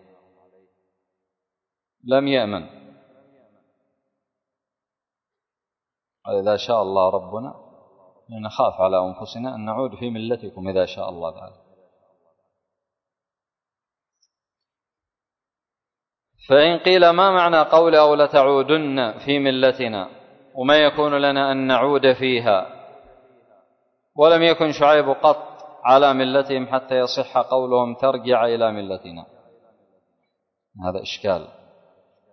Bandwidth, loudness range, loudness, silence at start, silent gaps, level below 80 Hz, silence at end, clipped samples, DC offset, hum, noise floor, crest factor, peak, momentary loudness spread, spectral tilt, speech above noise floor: 6.4 kHz; 14 LU; -18 LUFS; 2.05 s; none; -60 dBFS; 0.85 s; under 0.1%; under 0.1%; none; -89 dBFS; 20 dB; -2 dBFS; 17 LU; -6 dB/octave; 71 dB